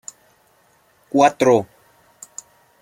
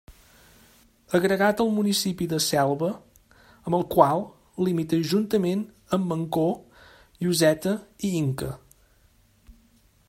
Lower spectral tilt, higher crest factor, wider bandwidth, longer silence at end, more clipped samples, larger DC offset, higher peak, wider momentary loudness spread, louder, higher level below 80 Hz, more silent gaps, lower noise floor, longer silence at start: about the same, -5 dB/octave vs -5 dB/octave; about the same, 20 dB vs 24 dB; about the same, 16 kHz vs 16 kHz; first, 1.15 s vs 0.55 s; neither; neither; about the same, -2 dBFS vs -2 dBFS; first, 24 LU vs 10 LU; first, -17 LUFS vs -25 LUFS; second, -66 dBFS vs -58 dBFS; neither; about the same, -58 dBFS vs -60 dBFS; first, 1.15 s vs 0.1 s